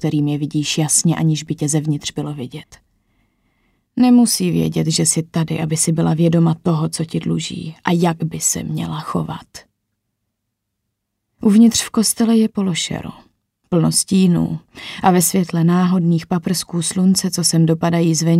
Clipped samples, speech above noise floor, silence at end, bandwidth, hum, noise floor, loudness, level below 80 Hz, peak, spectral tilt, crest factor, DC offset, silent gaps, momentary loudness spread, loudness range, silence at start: under 0.1%; 59 dB; 0 s; 16 kHz; none; -76 dBFS; -17 LUFS; -52 dBFS; -2 dBFS; -5 dB/octave; 16 dB; under 0.1%; none; 11 LU; 6 LU; 0 s